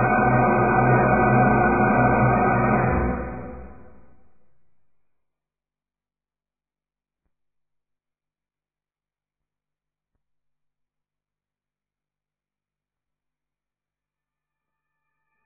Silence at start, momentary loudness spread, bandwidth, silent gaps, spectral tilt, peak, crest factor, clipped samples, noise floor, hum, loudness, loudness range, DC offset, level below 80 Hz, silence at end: 0 s; 12 LU; 2.7 kHz; none; -14.5 dB/octave; -6 dBFS; 20 dB; under 0.1%; under -90 dBFS; 50 Hz at -65 dBFS; -19 LUFS; 14 LU; under 0.1%; -42 dBFS; 11.8 s